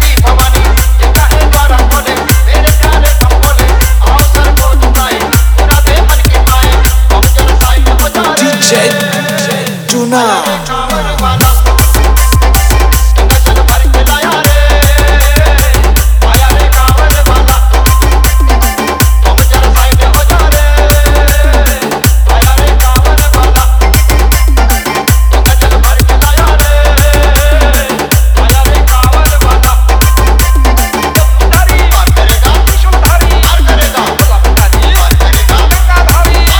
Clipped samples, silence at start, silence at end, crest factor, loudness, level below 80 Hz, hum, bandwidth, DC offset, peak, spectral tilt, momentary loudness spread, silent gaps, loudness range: 0.5%; 0 s; 0 s; 6 dB; -7 LUFS; -6 dBFS; none; over 20 kHz; under 0.1%; 0 dBFS; -4 dB/octave; 2 LU; none; 1 LU